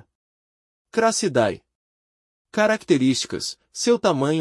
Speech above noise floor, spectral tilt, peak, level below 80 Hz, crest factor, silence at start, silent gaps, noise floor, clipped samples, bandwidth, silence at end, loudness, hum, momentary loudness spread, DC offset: over 69 dB; -4 dB/octave; -6 dBFS; -64 dBFS; 18 dB; 0.95 s; 1.75-2.45 s; under -90 dBFS; under 0.1%; 12 kHz; 0 s; -21 LUFS; none; 10 LU; under 0.1%